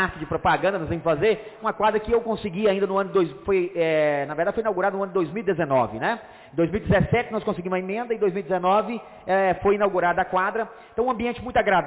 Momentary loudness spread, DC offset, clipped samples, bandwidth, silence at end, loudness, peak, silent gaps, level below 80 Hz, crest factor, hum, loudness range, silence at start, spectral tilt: 6 LU; under 0.1%; under 0.1%; 4 kHz; 0 s; -24 LUFS; -12 dBFS; none; -46 dBFS; 12 dB; none; 1 LU; 0 s; -10 dB/octave